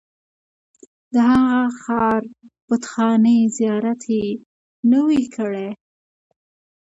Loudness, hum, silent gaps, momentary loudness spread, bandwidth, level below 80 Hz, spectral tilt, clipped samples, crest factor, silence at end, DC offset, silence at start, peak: -19 LUFS; none; 2.62-2.68 s, 4.46-4.83 s; 13 LU; 8 kHz; -56 dBFS; -6 dB/octave; under 0.1%; 14 dB; 1.1 s; under 0.1%; 1.1 s; -4 dBFS